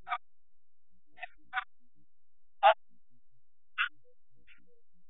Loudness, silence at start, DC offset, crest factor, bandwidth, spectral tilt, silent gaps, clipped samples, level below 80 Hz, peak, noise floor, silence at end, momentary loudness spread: -32 LUFS; 0.05 s; 0.4%; 26 dB; 4.1 kHz; 3.5 dB/octave; none; under 0.1%; -76 dBFS; -10 dBFS; -67 dBFS; 1.2 s; 22 LU